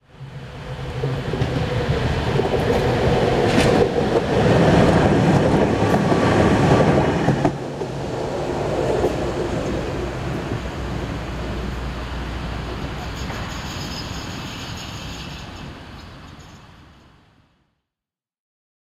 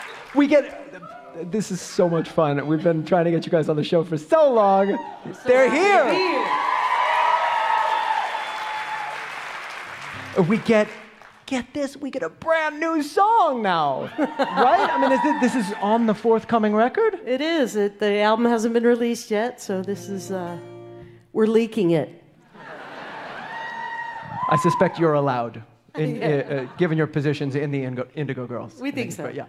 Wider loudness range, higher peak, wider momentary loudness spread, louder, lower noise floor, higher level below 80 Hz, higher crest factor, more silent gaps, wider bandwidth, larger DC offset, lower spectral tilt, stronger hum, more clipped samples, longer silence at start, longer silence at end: first, 16 LU vs 6 LU; about the same, -2 dBFS vs -4 dBFS; about the same, 16 LU vs 15 LU; about the same, -20 LUFS vs -21 LUFS; first, -89 dBFS vs -46 dBFS; first, -34 dBFS vs -64 dBFS; about the same, 18 dB vs 16 dB; neither; about the same, 14.5 kHz vs 14.5 kHz; neither; about the same, -6.5 dB/octave vs -6 dB/octave; neither; neither; first, 0.15 s vs 0 s; first, 2.15 s vs 0 s